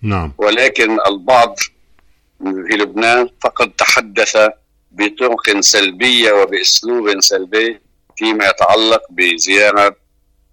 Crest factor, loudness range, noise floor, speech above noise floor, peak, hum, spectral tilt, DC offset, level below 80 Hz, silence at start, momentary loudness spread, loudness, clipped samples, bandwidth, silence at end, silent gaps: 14 dB; 3 LU; -56 dBFS; 43 dB; 0 dBFS; none; -2 dB/octave; under 0.1%; -44 dBFS; 0 s; 9 LU; -12 LUFS; under 0.1%; 18 kHz; 0.6 s; none